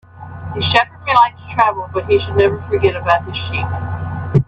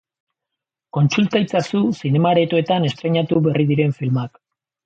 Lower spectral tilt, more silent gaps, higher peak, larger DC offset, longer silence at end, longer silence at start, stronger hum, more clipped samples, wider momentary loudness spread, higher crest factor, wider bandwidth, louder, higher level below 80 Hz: about the same, -7 dB/octave vs -7 dB/octave; neither; first, 0 dBFS vs -4 dBFS; neither; second, 0.05 s vs 0.6 s; second, 0.15 s vs 0.95 s; neither; neither; first, 11 LU vs 6 LU; about the same, 16 dB vs 14 dB; about the same, 8.2 kHz vs 7.8 kHz; about the same, -16 LUFS vs -18 LUFS; first, -42 dBFS vs -60 dBFS